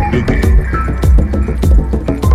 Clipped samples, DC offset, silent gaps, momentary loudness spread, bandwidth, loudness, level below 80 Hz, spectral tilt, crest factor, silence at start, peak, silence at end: under 0.1%; under 0.1%; none; 4 LU; 13.5 kHz; -13 LUFS; -12 dBFS; -8 dB/octave; 10 dB; 0 s; 0 dBFS; 0 s